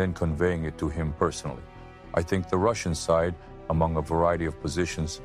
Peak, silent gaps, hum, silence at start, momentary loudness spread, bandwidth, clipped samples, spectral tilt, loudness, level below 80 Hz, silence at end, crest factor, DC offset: -10 dBFS; none; none; 0 s; 11 LU; 14 kHz; under 0.1%; -6 dB/octave; -27 LUFS; -40 dBFS; 0 s; 16 dB; under 0.1%